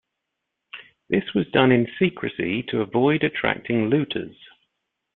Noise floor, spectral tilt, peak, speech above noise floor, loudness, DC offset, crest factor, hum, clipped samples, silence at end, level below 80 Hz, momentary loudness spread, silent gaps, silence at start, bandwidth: -81 dBFS; -10.5 dB/octave; -2 dBFS; 59 dB; -22 LUFS; under 0.1%; 22 dB; none; under 0.1%; 0.85 s; -58 dBFS; 20 LU; none; 0.75 s; 4.2 kHz